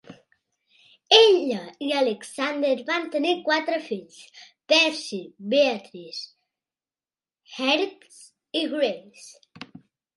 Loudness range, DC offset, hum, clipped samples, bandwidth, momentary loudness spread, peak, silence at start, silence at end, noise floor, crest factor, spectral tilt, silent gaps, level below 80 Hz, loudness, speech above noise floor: 7 LU; under 0.1%; none; under 0.1%; 11.5 kHz; 19 LU; -2 dBFS; 0.1 s; 0.55 s; under -90 dBFS; 24 dB; -2.5 dB/octave; none; -80 dBFS; -22 LUFS; over 66 dB